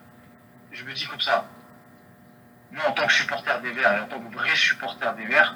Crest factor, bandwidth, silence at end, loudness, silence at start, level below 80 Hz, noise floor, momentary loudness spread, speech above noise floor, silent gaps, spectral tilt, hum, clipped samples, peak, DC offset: 24 dB; over 20 kHz; 0 s; -23 LUFS; 0.7 s; -74 dBFS; -52 dBFS; 16 LU; 28 dB; none; -2 dB/octave; none; under 0.1%; -2 dBFS; under 0.1%